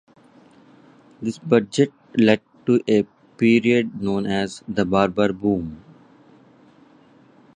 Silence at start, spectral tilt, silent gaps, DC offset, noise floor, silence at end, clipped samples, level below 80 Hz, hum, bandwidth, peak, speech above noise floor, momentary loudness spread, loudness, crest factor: 1.2 s; -6.5 dB/octave; none; under 0.1%; -52 dBFS; 1.8 s; under 0.1%; -54 dBFS; none; 9.6 kHz; -2 dBFS; 33 dB; 10 LU; -21 LUFS; 20 dB